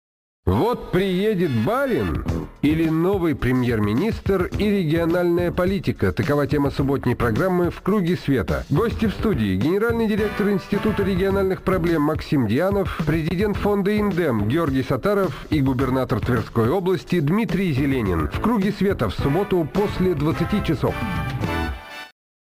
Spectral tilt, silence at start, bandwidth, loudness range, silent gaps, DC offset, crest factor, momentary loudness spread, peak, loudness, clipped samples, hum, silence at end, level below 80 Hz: -7.5 dB/octave; 0.45 s; 15.5 kHz; 1 LU; none; under 0.1%; 12 dB; 3 LU; -8 dBFS; -21 LUFS; under 0.1%; none; 0.35 s; -36 dBFS